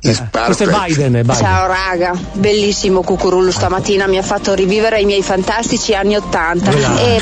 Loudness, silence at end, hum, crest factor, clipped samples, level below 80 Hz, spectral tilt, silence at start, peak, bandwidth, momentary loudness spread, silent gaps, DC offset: -13 LUFS; 0 s; none; 12 dB; under 0.1%; -32 dBFS; -4.5 dB/octave; 0 s; -2 dBFS; 9.4 kHz; 3 LU; none; under 0.1%